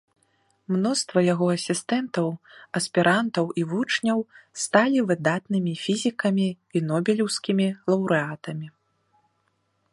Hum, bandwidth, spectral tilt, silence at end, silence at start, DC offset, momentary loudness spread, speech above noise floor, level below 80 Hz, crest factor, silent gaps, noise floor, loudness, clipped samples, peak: none; 11.5 kHz; -5 dB/octave; 1.25 s; 0.7 s; under 0.1%; 10 LU; 47 dB; -70 dBFS; 22 dB; none; -71 dBFS; -24 LUFS; under 0.1%; -2 dBFS